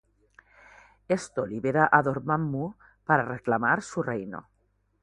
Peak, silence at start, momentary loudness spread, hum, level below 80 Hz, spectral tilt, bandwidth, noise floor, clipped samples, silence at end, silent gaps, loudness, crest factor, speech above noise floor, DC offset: -4 dBFS; 1.1 s; 14 LU; 50 Hz at -60 dBFS; -62 dBFS; -6.5 dB/octave; 11 kHz; -70 dBFS; under 0.1%; 0.6 s; none; -27 LUFS; 24 dB; 44 dB; under 0.1%